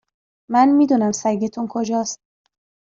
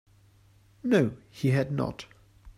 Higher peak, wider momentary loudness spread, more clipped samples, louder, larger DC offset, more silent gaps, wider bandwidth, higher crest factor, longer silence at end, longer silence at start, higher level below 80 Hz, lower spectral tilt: first, -4 dBFS vs -12 dBFS; second, 11 LU vs 16 LU; neither; first, -19 LUFS vs -28 LUFS; neither; neither; second, 7.8 kHz vs 14 kHz; about the same, 16 dB vs 18 dB; first, 0.8 s vs 0.05 s; second, 0.5 s vs 0.85 s; second, -66 dBFS vs -56 dBFS; second, -5 dB/octave vs -7.5 dB/octave